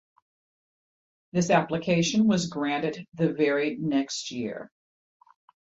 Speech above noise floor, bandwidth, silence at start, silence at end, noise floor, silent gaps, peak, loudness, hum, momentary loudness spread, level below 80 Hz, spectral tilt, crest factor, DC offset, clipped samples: over 64 dB; 8 kHz; 1.35 s; 0.95 s; under -90 dBFS; 3.08-3.12 s; -8 dBFS; -26 LUFS; none; 10 LU; -64 dBFS; -5 dB/octave; 20 dB; under 0.1%; under 0.1%